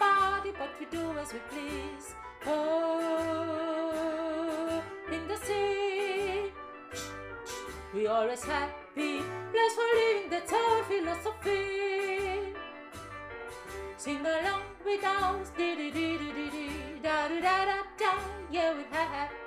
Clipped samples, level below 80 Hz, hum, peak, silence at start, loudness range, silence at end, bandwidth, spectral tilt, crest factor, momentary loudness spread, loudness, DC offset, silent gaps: under 0.1%; -56 dBFS; none; -14 dBFS; 0 s; 5 LU; 0 s; 15.5 kHz; -4 dB/octave; 18 dB; 13 LU; -32 LUFS; under 0.1%; none